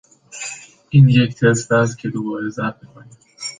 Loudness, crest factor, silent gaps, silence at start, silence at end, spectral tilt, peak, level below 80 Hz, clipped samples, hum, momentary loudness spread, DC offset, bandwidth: -17 LUFS; 16 dB; none; 0.35 s; 0.05 s; -6 dB/octave; -2 dBFS; -54 dBFS; under 0.1%; none; 18 LU; under 0.1%; 9.6 kHz